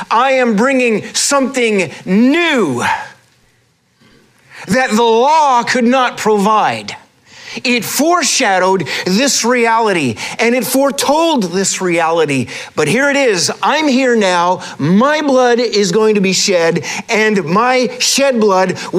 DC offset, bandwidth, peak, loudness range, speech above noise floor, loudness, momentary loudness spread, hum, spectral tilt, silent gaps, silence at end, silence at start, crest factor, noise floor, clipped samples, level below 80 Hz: under 0.1%; 15.5 kHz; -2 dBFS; 3 LU; 43 dB; -12 LUFS; 6 LU; none; -3.5 dB/octave; none; 0 s; 0 s; 10 dB; -56 dBFS; under 0.1%; -60 dBFS